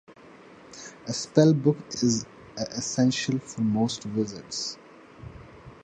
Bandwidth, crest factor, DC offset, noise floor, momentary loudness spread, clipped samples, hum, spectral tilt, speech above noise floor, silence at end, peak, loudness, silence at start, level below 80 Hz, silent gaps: 9.4 kHz; 22 dB; under 0.1%; -50 dBFS; 24 LU; under 0.1%; none; -5 dB/octave; 24 dB; 0.1 s; -4 dBFS; -26 LUFS; 0.1 s; -60 dBFS; none